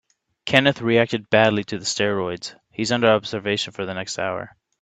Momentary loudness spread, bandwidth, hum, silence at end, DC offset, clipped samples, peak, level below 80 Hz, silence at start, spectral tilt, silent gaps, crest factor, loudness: 14 LU; 9.2 kHz; none; 0.35 s; under 0.1%; under 0.1%; 0 dBFS; -60 dBFS; 0.45 s; -4 dB/octave; none; 22 dB; -21 LUFS